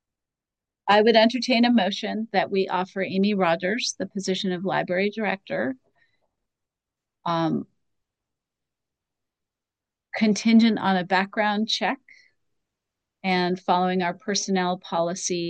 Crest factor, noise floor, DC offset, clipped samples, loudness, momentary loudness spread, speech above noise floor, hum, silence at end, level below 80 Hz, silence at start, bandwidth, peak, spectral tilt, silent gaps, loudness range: 20 dB; -89 dBFS; under 0.1%; under 0.1%; -23 LUFS; 10 LU; 66 dB; none; 0 s; -76 dBFS; 0.85 s; 9 kHz; -4 dBFS; -4.5 dB/octave; none; 11 LU